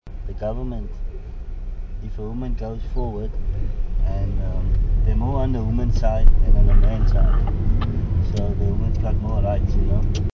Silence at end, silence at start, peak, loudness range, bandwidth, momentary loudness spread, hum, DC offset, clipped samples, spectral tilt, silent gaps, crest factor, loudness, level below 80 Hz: 0.05 s; 0.05 s; 0 dBFS; 9 LU; 6.2 kHz; 14 LU; none; 0.4%; under 0.1%; -9 dB/octave; none; 18 dB; -23 LUFS; -20 dBFS